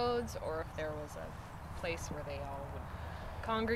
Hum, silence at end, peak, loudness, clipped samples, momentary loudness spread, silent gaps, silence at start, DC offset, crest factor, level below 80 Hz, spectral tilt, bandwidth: none; 0 s; -22 dBFS; -41 LUFS; under 0.1%; 9 LU; none; 0 s; under 0.1%; 18 dB; -50 dBFS; -5.5 dB/octave; 16 kHz